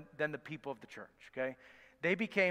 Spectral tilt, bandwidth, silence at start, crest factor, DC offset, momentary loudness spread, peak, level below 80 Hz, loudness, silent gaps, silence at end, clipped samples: -6 dB/octave; 15 kHz; 0 s; 22 dB; under 0.1%; 19 LU; -18 dBFS; -78 dBFS; -38 LUFS; none; 0 s; under 0.1%